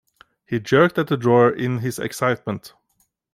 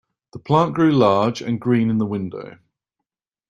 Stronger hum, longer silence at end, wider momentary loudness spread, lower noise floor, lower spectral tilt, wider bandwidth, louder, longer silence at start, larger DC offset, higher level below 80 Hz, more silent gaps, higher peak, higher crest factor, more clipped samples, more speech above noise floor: neither; second, 0.65 s vs 1 s; second, 12 LU vs 18 LU; second, -68 dBFS vs -83 dBFS; about the same, -6.5 dB/octave vs -7.5 dB/octave; first, 16 kHz vs 7.6 kHz; about the same, -20 LUFS vs -19 LUFS; first, 0.5 s vs 0.35 s; neither; about the same, -60 dBFS vs -56 dBFS; neither; about the same, -2 dBFS vs -2 dBFS; about the same, 18 dB vs 18 dB; neither; second, 48 dB vs 65 dB